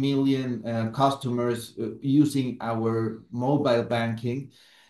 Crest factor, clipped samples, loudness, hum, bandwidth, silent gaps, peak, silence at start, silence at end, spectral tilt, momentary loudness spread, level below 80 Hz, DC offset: 18 dB; under 0.1%; -26 LUFS; none; 12.5 kHz; none; -8 dBFS; 0 s; 0.45 s; -7 dB/octave; 9 LU; -66 dBFS; under 0.1%